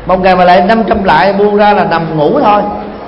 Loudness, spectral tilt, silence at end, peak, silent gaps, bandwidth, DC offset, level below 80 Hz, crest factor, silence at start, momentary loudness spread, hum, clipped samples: -8 LUFS; -8 dB/octave; 0 s; 0 dBFS; none; 6.8 kHz; under 0.1%; -32 dBFS; 8 dB; 0 s; 5 LU; none; 0.5%